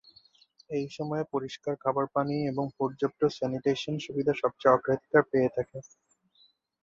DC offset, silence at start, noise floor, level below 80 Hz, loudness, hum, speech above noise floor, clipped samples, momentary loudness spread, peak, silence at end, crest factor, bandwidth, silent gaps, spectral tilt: under 0.1%; 0.7 s; -66 dBFS; -66 dBFS; -29 LUFS; none; 37 dB; under 0.1%; 10 LU; -8 dBFS; 1.05 s; 22 dB; 7.6 kHz; none; -6.5 dB/octave